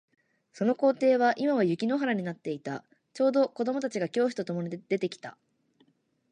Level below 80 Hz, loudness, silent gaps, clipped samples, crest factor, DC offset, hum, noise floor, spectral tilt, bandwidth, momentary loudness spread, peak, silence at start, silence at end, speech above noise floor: -80 dBFS; -28 LUFS; none; under 0.1%; 16 dB; under 0.1%; none; -68 dBFS; -6.5 dB/octave; 10 kHz; 12 LU; -14 dBFS; 0.55 s; 1 s; 41 dB